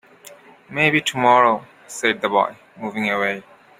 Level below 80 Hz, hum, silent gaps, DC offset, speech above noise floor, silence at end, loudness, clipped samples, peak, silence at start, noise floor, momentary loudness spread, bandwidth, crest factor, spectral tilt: -64 dBFS; none; none; under 0.1%; 26 dB; 0.4 s; -19 LUFS; under 0.1%; -2 dBFS; 0.3 s; -45 dBFS; 16 LU; 16 kHz; 20 dB; -4 dB/octave